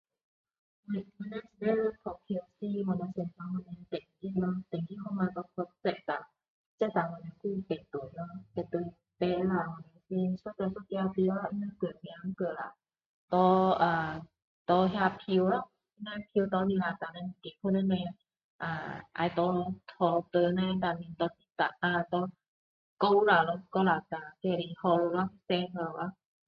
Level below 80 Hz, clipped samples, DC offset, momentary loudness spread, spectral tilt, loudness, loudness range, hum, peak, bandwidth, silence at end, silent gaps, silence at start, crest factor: -66 dBFS; under 0.1%; under 0.1%; 13 LU; -9 dB/octave; -32 LUFS; 7 LU; none; -12 dBFS; 5.4 kHz; 0.35 s; 6.48-6.78 s, 13.06-13.28 s, 14.44-14.65 s, 18.44-18.59 s, 22.48-22.97 s; 0.9 s; 20 dB